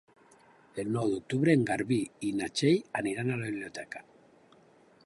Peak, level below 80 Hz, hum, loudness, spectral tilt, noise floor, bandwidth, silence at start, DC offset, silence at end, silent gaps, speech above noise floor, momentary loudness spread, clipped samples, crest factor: -12 dBFS; -68 dBFS; none; -30 LUFS; -6 dB/octave; -61 dBFS; 11.5 kHz; 0.75 s; under 0.1%; 1.05 s; none; 31 dB; 15 LU; under 0.1%; 20 dB